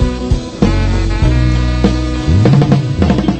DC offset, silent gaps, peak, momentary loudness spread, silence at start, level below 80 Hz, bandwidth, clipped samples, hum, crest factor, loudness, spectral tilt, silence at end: under 0.1%; none; 0 dBFS; 6 LU; 0 s; -16 dBFS; 8.8 kHz; under 0.1%; none; 12 dB; -13 LUFS; -7.5 dB/octave; 0 s